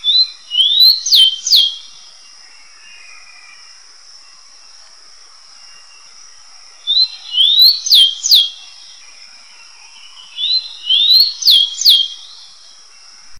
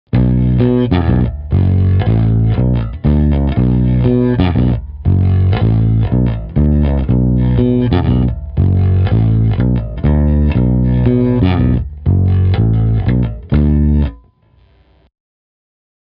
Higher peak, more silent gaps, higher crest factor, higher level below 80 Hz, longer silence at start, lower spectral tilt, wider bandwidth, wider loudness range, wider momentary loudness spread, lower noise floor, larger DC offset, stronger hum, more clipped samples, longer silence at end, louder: about the same, 0 dBFS vs 0 dBFS; neither; about the same, 16 dB vs 12 dB; second, -66 dBFS vs -20 dBFS; about the same, 0.05 s vs 0.15 s; second, 5.5 dB/octave vs -12.5 dB/octave; first, over 20 kHz vs 5 kHz; first, 7 LU vs 2 LU; first, 12 LU vs 4 LU; second, -42 dBFS vs -50 dBFS; first, 0.6% vs under 0.1%; neither; neither; second, 0 s vs 1.9 s; first, -9 LUFS vs -13 LUFS